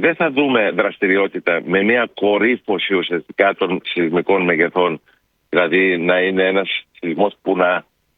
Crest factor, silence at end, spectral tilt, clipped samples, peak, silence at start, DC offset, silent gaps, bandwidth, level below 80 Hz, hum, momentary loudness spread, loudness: 16 dB; 0.35 s; -8 dB/octave; under 0.1%; 0 dBFS; 0 s; under 0.1%; none; 4.6 kHz; -62 dBFS; none; 6 LU; -17 LUFS